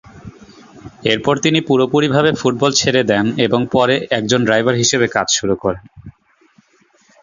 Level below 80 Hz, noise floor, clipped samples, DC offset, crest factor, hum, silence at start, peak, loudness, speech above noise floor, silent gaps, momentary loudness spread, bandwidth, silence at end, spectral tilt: -50 dBFS; -55 dBFS; under 0.1%; under 0.1%; 16 dB; none; 0.15 s; 0 dBFS; -15 LUFS; 40 dB; none; 5 LU; 7.6 kHz; 1.1 s; -4 dB/octave